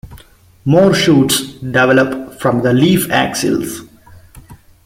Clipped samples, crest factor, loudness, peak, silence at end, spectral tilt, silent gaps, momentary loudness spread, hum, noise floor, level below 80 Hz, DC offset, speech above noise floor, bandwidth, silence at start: under 0.1%; 14 dB; -13 LUFS; 0 dBFS; 0.3 s; -5 dB/octave; none; 9 LU; none; -44 dBFS; -44 dBFS; under 0.1%; 31 dB; 16.5 kHz; 0.05 s